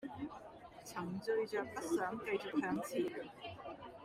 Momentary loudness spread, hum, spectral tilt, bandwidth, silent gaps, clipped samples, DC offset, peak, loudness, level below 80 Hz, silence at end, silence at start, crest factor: 12 LU; none; -5 dB/octave; 16 kHz; none; under 0.1%; under 0.1%; -24 dBFS; -41 LUFS; -72 dBFS; 0 s; 0 s; 16 dB